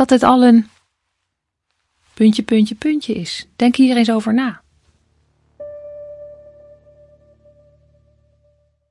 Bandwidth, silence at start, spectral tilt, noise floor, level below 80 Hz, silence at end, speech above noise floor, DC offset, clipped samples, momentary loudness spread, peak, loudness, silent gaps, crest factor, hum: 11.5 kHz; 0 s; -5.5 dB/octave; -76 dBFS; -58 dBFS; 2.55 s; 62 dB; under 0.1%; under 0.1%; 24 LU; 0 dBFS; -15 LUFS; none; 18 dB; none